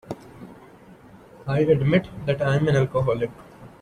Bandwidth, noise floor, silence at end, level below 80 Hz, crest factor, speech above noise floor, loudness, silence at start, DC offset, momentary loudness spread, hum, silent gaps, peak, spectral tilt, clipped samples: 9.8 kHz; -48 dBFS; 0.1 s; -50 dBFS; 18 dB; 26 dB; -22 LUFS; 0.05 s; under 0.1%; 21 LU; none; none; -6 dBFS; -8 dB/octave; under 0.1%